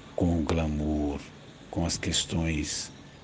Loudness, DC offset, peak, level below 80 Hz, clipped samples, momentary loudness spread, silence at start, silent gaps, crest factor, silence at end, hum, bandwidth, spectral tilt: -29 LUFS; under 0.1%; -12 dBFS; -42 dBFS; under 0.1%; 12 LU; 0 s; none; 18 dB; 0 s; none; 10 kHz; -4.5 dB/octave